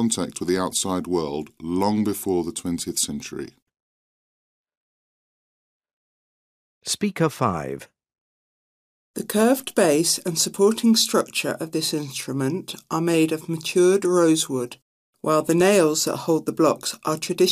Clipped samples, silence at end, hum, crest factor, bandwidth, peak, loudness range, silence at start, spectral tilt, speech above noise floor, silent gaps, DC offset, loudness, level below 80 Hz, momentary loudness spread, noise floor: under 0.1%; 0 s; none; 18 dB; 15.5 kHz; -6 dBFS; 9 LU; 0 s; -4 dB/octave; over 68 dB; 3.62-3.66 s, 3.80-4.64 s, 4.77-5.80 s, 5.93-6.81 s, 8.18-9.14 s, 14.82-15.13 s; under 0.1%; -22 LUFS; -60 dBFS; 12 LU; under -90 dBFS